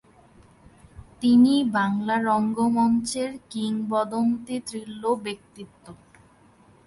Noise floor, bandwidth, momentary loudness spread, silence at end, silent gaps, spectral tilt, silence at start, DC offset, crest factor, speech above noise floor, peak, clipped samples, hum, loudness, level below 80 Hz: -55 dBFS; 11.5 kHz; 17 LU; 0.9 s; none; -5 dB/octave; 0.95 s; under 0.1%; 16 dB; 32 dB; -10 dBFS; under 0.1%; none; -24 LUFS; -58 dBFS